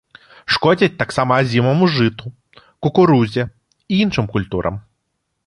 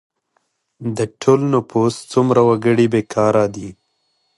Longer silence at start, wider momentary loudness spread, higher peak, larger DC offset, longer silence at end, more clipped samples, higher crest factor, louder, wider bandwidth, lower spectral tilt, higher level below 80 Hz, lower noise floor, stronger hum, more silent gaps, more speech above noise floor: second, 0.5 s vs 0.8 s; about the same, 13 LU vs 12 LU; about the same, -2 dBFS vs 0 dBFS; neither; about the same, 0.65 s vs 0.65 s; neither; about the same, 16 dB vs 16 dB; about the same, -17 LUFS vs -16 LUFS; about the same, 11.5 kHz vs 11.5 kHz; about the same, -7 dB/octave vs -7 dB/octave; first, -46 dBFS vs -54 dBFS; first, -72 dBFS vs -67 dBFS; neither; neither; first, 57 dB vs 51 dB